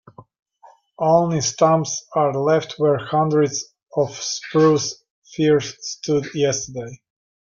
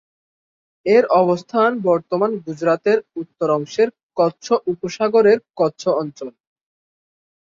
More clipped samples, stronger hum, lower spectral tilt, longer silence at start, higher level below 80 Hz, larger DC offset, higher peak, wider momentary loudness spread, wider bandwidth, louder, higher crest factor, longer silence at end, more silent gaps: neither; neither; about the same, -5 dB/octave vs -6 dB/octave; second, 0.2 s vs 0.85 s; first, -60 dBFS vs -66 dBFS; neither; about the same, -4 dBFS vs -2 dBFS; about the same, 12 LU vs 10 LU; about the same, 7.4 kHz vs 7.6 kHz; about the same, -20 LUFS vs -18 LUFS; about the same, 18 dB vs 16 dB; second, 0.5 s vs 1.3 s; first, 0.39-0.46 s, 5.10-5.22 s vs 4.03-4.09 s